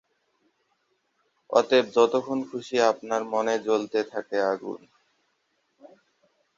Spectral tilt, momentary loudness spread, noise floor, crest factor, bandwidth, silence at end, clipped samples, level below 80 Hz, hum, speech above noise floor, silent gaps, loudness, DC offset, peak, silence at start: -4 dB/octave; 10 LU; -73 dBFS; 22 dB; 7.6 kHz; 1.8 s; under 0.1%; -74 dBFS; none; 48 dB; none; -25 LUFS; under 0.1%; -6 dBFS; 1.5 s